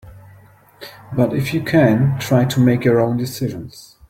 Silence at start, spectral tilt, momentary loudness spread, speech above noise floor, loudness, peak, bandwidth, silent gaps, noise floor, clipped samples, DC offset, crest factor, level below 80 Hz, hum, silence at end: 0.05 s; -7 dB/octave; 22 LU; 31 dB; -17 LUFS; -2 dBFS; 16 kHz; none; -47 dBFS; under 0.1%; under 0.1%; 16 dB; -48 dBFS; none; 0.3 s